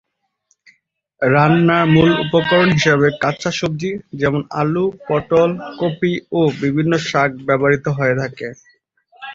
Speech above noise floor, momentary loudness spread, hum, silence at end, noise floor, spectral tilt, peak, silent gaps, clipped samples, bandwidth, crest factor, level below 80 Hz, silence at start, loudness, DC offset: 49 dB; 9 LU; none; 0 s; -65 dBFS; -6.5 dB/octave; 0 dBFS; none; under 0.1%; 7.6 kHz; 16 dB; -48 dBFS; 1.2 s; -16 LUFS; under 0.1%